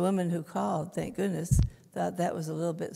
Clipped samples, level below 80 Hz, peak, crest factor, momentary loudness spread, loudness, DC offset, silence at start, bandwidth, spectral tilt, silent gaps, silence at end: under 0.1%; -40 dBFS; -12 dBFS; 18 dB; 6 LU; -31 LUFS; under 0.1%; 0 s; 15.5 kHz; -7 dB/octave; none; 0 s